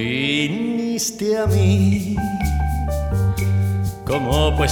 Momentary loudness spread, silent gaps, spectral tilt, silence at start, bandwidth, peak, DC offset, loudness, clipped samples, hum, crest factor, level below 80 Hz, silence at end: 6 LU; none; -5.5 dB/octave; 0 s; 18 kHz; -4 dBFS; under 0.1%; -20 LUFS; under 0.1%; none; 14 dB; -28 dBFS; 0 s